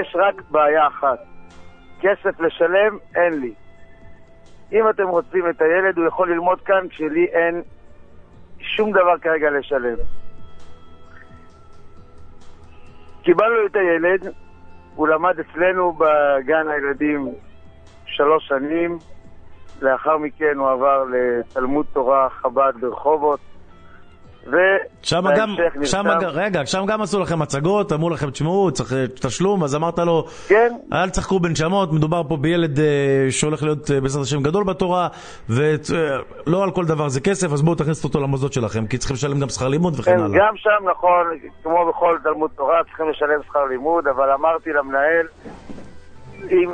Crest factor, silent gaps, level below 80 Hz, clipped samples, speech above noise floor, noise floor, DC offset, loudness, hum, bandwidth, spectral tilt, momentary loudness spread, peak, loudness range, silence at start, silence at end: 20 dB; none; -44 dBFS; under 0.1%; 24 dB; -42 dBFS; under 0.1%; -19 LUFS; none; 9.6 kHz; -5.5 dB/octave; 7 LU; 0 dBFS; 3 LU; 0 s; 0 s